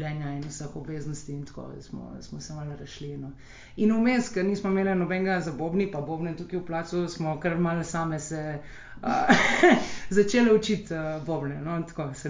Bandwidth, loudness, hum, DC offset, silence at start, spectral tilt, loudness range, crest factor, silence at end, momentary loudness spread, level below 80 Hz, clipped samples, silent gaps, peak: 7.6 kHz; -26 LUFS; none; under 0.1%; 0 s; -5.5 dB/octave; 10 LU; 22 dB; 0 s; 19 LU; -52 dBFS; under 0.1%; none; -4 dBFS